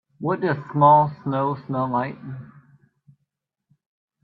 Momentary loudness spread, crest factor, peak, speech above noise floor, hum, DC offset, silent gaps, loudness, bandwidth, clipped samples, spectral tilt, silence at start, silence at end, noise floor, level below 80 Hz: 20 LU; 20 dB; -4 dBFS; 57 dB; none; under 0.1%; none; -21 LUFS; 4.8 kHz; under 0.1%; -11 dB/octave; 0.2 s; 1.8 s; -78 dBFS; -64 dBFS